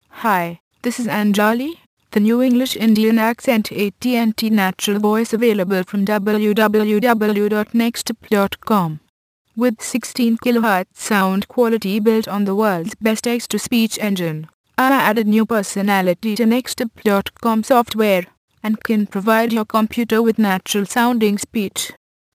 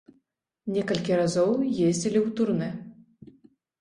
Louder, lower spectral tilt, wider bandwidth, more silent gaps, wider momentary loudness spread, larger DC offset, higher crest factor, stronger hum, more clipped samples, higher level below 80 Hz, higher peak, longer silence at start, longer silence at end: first, -17 LUFS vs -26 LUFS; about the same, -5 dB/octave vs -6 dB/octave; first, 15.5 kHz vs 11.5 kHz; first, 0.60-0.71 s, 1.86-1.97 s, 9.09-9.45 s, 14.54-14.64 s, 18.37-18.48 s vs none; about the same, 8 LU vs 10 LU; neither; about the same, 18 dB vs 16 dB; neither; neither; first, -58 dBFS vs -64 dBFS; first, 0 dBFS vs -10 dBFS; second, 0.15 s vs 0.65 s; second, 0.4 s vs 0.9 s